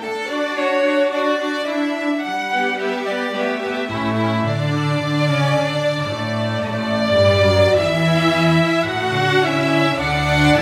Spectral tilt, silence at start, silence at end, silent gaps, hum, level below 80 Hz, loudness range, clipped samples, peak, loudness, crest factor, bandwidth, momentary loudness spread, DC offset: -6 dB/octave; 0 s; 0 s; none; none; -42 dBFS; 5 LU; under 0.1%; -4 dBFS; -18 LUFS; 14 dB; 15.5 kHz; 7 LU; under 0.1%